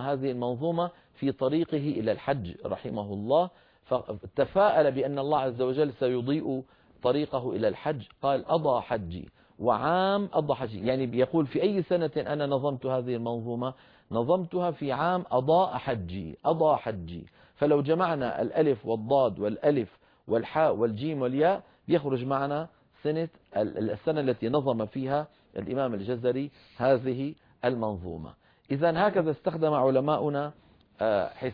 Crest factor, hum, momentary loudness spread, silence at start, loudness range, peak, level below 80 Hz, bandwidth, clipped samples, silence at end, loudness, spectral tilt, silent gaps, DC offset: 16 dB; none; 9 LU; 0 s; 3 LU; -12 dBFS; -60 dBFS; 5.2 kHz; under 0.1%; 0 s; -28 LUFS; -10 dB/octave; none; under 0.1%